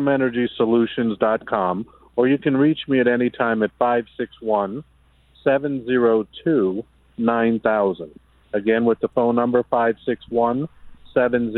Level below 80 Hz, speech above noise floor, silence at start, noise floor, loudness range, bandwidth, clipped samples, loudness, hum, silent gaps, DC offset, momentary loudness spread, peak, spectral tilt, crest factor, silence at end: -56 dBFS; 35 dB; 0 s; -54 dBFS; 2 LU; 4.1 kHz; under 0.1%; -21 LUFS; none; none; under 0.1%; 10 LU; -4 dBFS; -9.5 dB/octave; 16 dB; 0 s